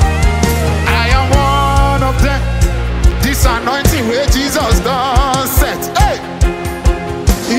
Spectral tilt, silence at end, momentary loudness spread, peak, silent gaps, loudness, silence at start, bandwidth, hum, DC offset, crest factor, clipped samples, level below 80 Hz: -5 dB/octave; 0 s; 5 LU; 0 dBFS; none; -13 LUFS; 0 s; 16.5 kHz; none; under 0.1%; 12 dB; under 0.1%; -16 dBFS